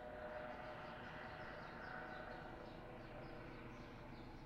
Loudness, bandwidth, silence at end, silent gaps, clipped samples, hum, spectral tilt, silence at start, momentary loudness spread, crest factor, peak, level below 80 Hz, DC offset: -53 LUFS; 16 kHz; 0 s; none; under 0.1%; none; -6.5 dB/octave; 0 s; 5 LU; 14 dB; -38 dBFS; -64 dBFS; under 0.1%